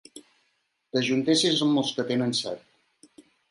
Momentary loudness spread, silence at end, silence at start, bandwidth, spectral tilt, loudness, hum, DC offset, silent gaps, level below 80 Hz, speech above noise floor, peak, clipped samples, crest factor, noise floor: 10 LU; 0.95 s; 0.15 s; 11.5 kHz; -4 dB/octave; -25 LUFS; none; under 0.1%; none; -74 dBFS; 48 dB; -10 dBFS; under 0.1%; 18 dB; -73 dBFS